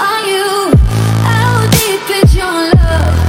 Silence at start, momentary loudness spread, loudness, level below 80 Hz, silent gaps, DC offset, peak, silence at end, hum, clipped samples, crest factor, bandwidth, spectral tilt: 0 s; 3 LU; -11 LUFS; -16 dBFS; none; under 0.1%; 0 dBFS; 0 s; none; 1%; 10 dB; 17.5 kHz; -5 dB/octave